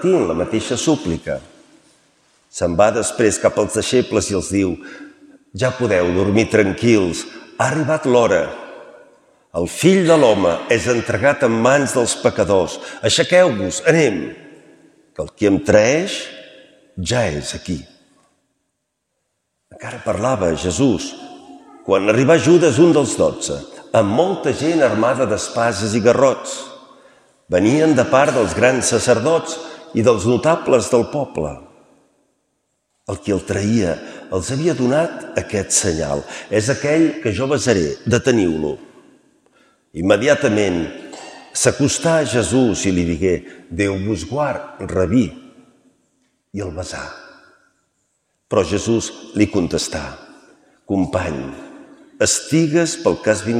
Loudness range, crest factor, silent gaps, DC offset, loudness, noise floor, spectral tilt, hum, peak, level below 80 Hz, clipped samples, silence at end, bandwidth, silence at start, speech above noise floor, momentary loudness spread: 8 LU; 18 dB; none; under 0.1%; -17 LUFS; -73 dBFS; -4.5 dB/octave; none; 0 dBFS; -46 dBFS; under 0.1%; 0 s; 14.5 kHz; 0 s; 57 dB; 15 LU